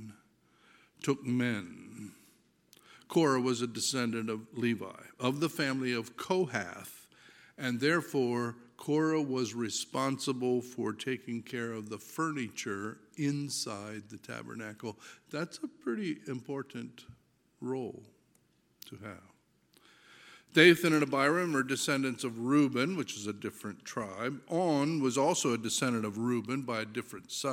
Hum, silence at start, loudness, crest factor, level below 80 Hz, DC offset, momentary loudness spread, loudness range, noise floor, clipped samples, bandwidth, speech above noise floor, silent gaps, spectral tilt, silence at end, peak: none; 0 s; -32 LUFS; 26 dB; -78 dBFS; under 0.1%; 16 LU; 12 LU; -70 dBFS; under 0.1%; 17 kHz; 38 dB; none; -4.5 dB/octave; 0 s; -8 dBFS